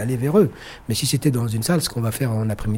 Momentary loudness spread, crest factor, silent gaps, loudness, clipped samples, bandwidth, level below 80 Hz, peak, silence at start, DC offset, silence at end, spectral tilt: 5 LU; 16 dB; none; -21 LUFS; under 0.1%; 17 kHz; -42 dBFS; -4 dBFS; 0 s; under 0.1%; 0 s; -5.5 dB/octave